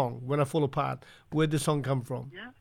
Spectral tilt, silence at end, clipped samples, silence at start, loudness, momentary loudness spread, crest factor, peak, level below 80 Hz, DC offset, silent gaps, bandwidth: -6.5 dB/octave; 0.1 s; under 0.1%; 0 s; -30 LUFS; 11 LU; 16 dB; -14 dBFS; -58 dBFS; under 0.1%; none; 16 kHz